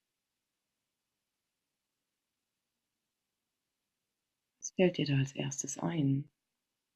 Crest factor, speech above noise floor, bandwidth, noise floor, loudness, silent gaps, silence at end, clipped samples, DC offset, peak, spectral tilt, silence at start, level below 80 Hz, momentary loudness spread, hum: 24 dB; 56 dB; 11 kHz; -88 dBFS; -33 LUFS; none; 0.7 s; under 0.1%; under 0.1%; -14 dBFS; -5.5 dB/octave; 4.6 s; -74 dBFS; 11 LU; none